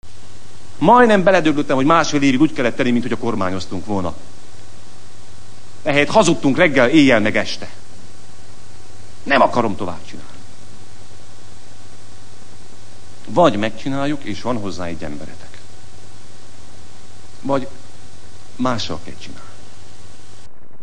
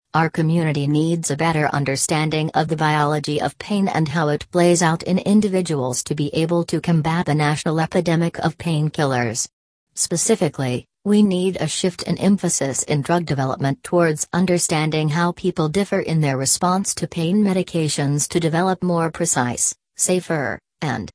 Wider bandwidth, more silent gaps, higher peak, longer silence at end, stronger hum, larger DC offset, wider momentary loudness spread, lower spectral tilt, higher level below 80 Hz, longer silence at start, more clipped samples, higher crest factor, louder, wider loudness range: about the same, 10.5 kHz vs 11 kHz; second, none vs 9.53-9.87 s; about the same, 0 dBFS vs -2 dBFS; first, 1.3 s vs 0.05 s; neither; first, 9% vs under 0.1%; first, 23 LU vs 5 LU; about the same, -5 dB/octave vs -5 dB/octave; about the same, -50 dBFS vs -54 dBFS; second, 0 s vs 0.15 s; neither; about the same, 20 dB vs 16 dB; first, -17 LUFS vs -20 LUFS; first, 14 LU vs 1 LU